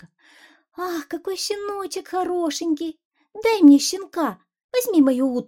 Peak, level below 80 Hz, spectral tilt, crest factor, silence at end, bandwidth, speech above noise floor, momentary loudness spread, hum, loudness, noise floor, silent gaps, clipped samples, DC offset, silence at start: -2 dBFS; -66 dBFS; -3 dB/octave; 18 dB; 0.05 s; 16.5 kHz; 33 dB; 15 LU; none; -21 LUFS; -53 dBFS; 3.05-3.11 s, 4.64-4.69 s; under 0.1%; under 0.1%; 0.8 s